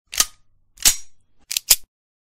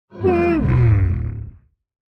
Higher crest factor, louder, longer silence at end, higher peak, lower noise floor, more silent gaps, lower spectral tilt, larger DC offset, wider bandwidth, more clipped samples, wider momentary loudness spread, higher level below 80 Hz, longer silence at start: first, 24 dB vs 12 dB; about the same, -19 LUFS vs -18 LUFS; about the same, 0.55 s vs 0.65 s; first, 0 dBFS vs -6 dBFS; first, -53 dBFS vs -43 dBFS; neither; second, 2.5 dB/octave vs -10.5 dB/octave; neither; first, 16.5 kHz vs 5.6 kHz; neither; second, 9 LU vs 16 LU; second, -42 dBFS vs -30 dBFS; about the same, 0.1 s vs 0.15 s